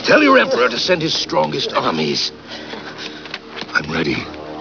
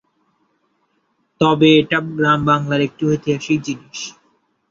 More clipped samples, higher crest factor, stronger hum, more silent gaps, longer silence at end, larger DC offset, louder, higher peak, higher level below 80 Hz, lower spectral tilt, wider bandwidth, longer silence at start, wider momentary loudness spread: neither; about the same, 18 dB vs 18 dB; neither; neither; second, 0 s vs 0.6 s; first, 0.1% vs under 0.1%; about the same, -16 LUFS vs -16 LUFS; about the same, 0 dBFS vs -2 dBFS; about the same, -50 dBFS vs -54 dBFS; second, -4 dB/octave vs -5.5 dB/octave; second, 5.4 kHz vs 7.6 kHz; second, 0 s vs 1.4 s; about the same, 17 LU vs 15 LU